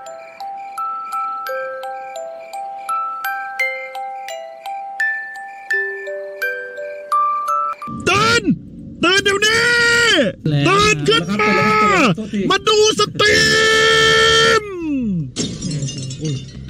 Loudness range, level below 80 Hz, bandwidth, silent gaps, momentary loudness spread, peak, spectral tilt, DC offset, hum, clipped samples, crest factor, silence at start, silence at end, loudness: 11 LU; -44 dBFS; 16 kHz; none; 18 LU; -4 dBFS; -3.5 dB/octave; under 0.1%; none; under 0.1%; 14 dB; 0 s; 0 s; -15 LUFS